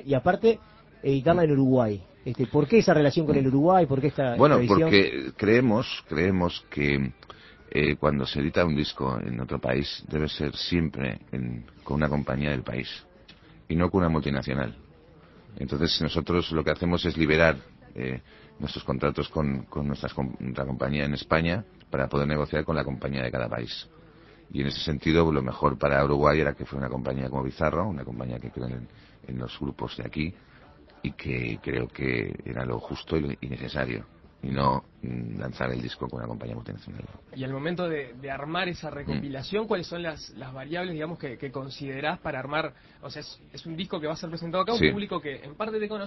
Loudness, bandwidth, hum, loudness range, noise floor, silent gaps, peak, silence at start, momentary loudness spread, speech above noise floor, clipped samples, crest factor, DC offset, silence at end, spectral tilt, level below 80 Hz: -27 LUFS; 6 kHz; none; 11 LU; -53 dBFS; none; -2 dBFS; 0 s; 15 LU; 26 dB; under 0.1%; 24 dB; under 0.1%; 0 s; -7.5 dB/octave; -44 dBFS